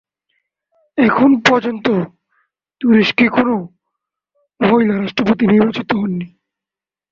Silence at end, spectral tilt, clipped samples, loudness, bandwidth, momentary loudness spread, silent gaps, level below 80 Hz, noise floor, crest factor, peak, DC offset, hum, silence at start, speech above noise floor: 0.85 s; -6.5 dB/octave; under 0.1%; -15 LUFS; 7.4 kHz; 12 LU; none; -54 dBFS; -89 dBFS; 16 dB; 0 dBFS; under 0.1%; none; 0.95 s; 75 dB